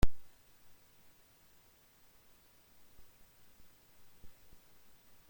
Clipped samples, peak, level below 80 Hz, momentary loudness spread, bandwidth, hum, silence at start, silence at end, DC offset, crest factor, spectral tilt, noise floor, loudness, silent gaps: under 0.1%; -14 dBFS; -48 dBFS; 1 LU; 16.5 kHz; none; 0.05 s; 1 s; under 0.1%; 24 dB; -6 dB/octave; -65 dBFS; -56 LUFS; none